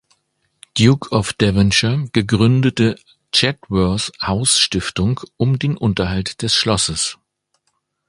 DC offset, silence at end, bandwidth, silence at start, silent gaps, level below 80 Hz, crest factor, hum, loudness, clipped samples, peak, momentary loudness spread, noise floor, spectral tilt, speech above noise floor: under 0.1%; 0.95 s; 11.5 kHz; 0.75 s; none; -38 dBFS; 18 dB; none; -17 LUFS; under 0.1%; 0 dBFS; 7 LU; -70 dBFS; -4.5 dB/octave; 53 dB